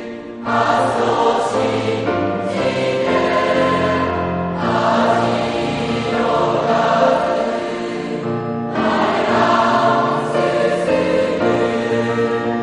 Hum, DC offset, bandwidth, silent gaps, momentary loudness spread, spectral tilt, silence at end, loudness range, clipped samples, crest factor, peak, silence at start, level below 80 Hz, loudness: none; under 0.1%; 10.5 kHz; none; 6 LU; -6 dB/octave; 0 s; 2 LU; under 0.1%; 14 dB; -2 dBFS; 0 s; -48 dBFS; -17 LUFS